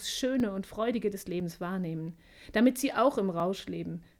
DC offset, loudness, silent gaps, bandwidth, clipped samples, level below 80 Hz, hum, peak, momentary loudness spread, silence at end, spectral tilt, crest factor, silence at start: under 0.1%; -31 LUFS; none; 17 kHz; under 0.1%; -60 dBFS; none; -12 dBFS; 10 LU; 0.15 s; -5 dB/octave; 18 dB; 0 s